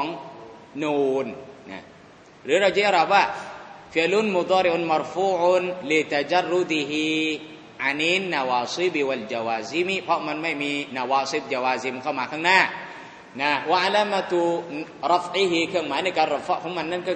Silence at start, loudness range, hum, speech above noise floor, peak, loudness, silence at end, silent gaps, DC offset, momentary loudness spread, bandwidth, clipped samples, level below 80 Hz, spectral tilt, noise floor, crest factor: 0 s; 3 LU; none; 26 dB; -2 dBFS; -23 LUFS; 0 s; none; under 0.1%; 16 LU; 9 kHz; under 0.1%; -68 dBFS; -4 dB/octave; -49 dBFS; 22 dB